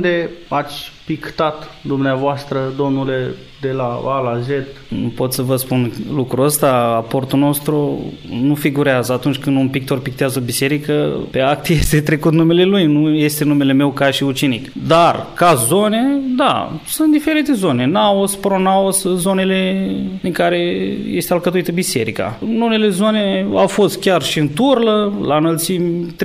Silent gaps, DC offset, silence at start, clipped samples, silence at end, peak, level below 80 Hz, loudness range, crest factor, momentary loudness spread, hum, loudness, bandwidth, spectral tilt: none; under 0.1%; 0 s; under 0.1%; 0 s; 0 dBFS; -40 dBFS; 6 LU; 14 dB; 8 LU; none; -16 LUFS; 16 kHz; -5 dB/octave